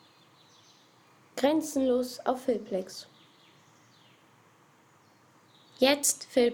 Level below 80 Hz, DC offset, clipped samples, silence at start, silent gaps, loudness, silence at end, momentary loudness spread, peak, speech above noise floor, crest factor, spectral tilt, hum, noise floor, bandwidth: -70 dBFS; under 0.1%; under 0.1%; 1.35 s; none; -28 LUFS; 0 s; 14 LU; -10 dBFS; 34 dB; 22 dB; -2 dB/octave; none; -61 dBFS; 19 kHz